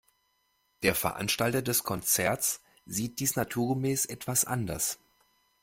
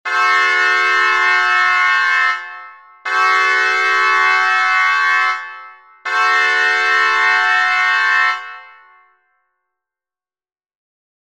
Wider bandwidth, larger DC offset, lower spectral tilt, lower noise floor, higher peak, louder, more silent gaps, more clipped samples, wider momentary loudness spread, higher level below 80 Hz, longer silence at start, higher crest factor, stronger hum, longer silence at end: first, 16.5 kHz vs 14 kHz; second, under 0.1% vs 0.3%; first, -3.5 dB/octave vs 2.5 dB/octave; second, -73 dBFS vs under -90 dBFS; second, -10 dBFS vs -2 dBFS; second, -29 LUFS vs -13 LUFS; neither; neither; second, 7 LU vs 11 LU; first, -58 dBFS vs -70 dBFS; first, 0.8 s vs 0.05 s; first, 22 dB vs 14 dB; neither; second, 0.7 s vs 2.65 s